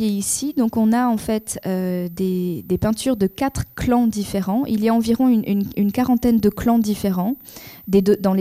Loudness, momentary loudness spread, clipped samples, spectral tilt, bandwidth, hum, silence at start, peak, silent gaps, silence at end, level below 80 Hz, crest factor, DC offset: -20 LUFS; 7 LU; under 0.1%; -6 dB/octave; 15 kHz; none; 0 s; -6 dBFS; none; 0 s; -44 dBFS; 14 dB; under 0.1%